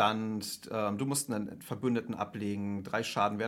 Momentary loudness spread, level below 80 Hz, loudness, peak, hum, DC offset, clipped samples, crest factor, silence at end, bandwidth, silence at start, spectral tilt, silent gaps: 7 LU; -72 dBFS; -34 LUFS; -12 dBFS; none; under 0.1%; under 0.1%; 20 dB; 0 s; 16.5 kHz; 0 s; -4.5 dB/octave; none